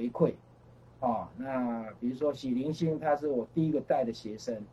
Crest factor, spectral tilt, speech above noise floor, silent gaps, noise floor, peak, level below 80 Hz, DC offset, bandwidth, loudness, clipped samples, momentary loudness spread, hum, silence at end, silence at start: 18 dB; -7.5 dB/octave; 25 dB; none; -56 dBFS; -12 dBFS; -66 dBFS; under 0.1%; 11.5 kHz; -32 LUFS; under 0.1%; 7 LU; none; 0 s; 0 s